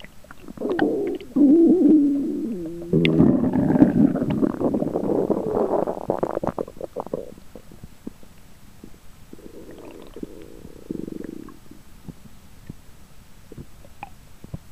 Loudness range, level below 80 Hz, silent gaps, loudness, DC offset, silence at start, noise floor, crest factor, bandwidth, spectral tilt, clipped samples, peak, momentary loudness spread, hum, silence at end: 24 LU; -48 dBFS; none; -21 LUFS; 0.5%; 0.05 s; -47 dBFS; 22 dB; 14.5 kHz; -8.5 dB/octave; under 0.1%; 0 dBFS; 26 LU; none; 0.15 s